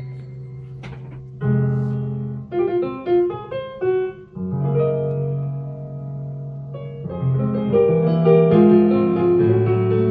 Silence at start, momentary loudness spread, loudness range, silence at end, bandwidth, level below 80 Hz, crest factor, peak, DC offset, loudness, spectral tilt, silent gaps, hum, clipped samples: 0 s; 20 LU; 8 LU; 0 s; 4.7 kHz; -52 dBFS; 16 dB; -2 dBFS; under 0.1%; -19 LUFS; -11.5 dB/octave; none; none; under 0.1%